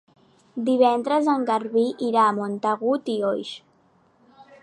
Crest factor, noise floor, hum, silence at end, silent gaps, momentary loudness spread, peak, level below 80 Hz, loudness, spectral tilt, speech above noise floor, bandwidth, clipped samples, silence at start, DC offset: 18 dB; -61 dBFS; none; 1.05 s; none; 11 LU; -6 dBFS; -78 dBFS; -22 LUFS; -6 dB/octave; 39 dB; 11 kHz; under 0.1%; 0.55 s; under 0.1%